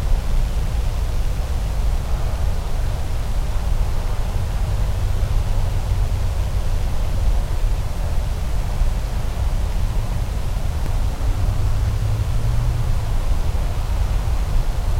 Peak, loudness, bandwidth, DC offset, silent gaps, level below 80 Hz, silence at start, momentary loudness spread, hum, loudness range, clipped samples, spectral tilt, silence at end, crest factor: -6 dBFS; -24 LUFS; 15.5 kHz; under 0.1%; none; -20 dBFS; 0 s; 3 LU; none; 2 LU; under 0.1%; -6 dB/octave; 0 s; 12 dB